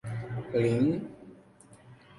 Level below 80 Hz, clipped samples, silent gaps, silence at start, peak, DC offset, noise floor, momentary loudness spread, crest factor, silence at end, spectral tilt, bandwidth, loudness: -62 dBFS; under 0.1%; none; 0.05 s; -16 dBFS; under 0.1%; -56 dBFS; 18 LU; 16 dB; 0.05 s; -8.5 dB/octave; 11.5 kHz; -29 LUFS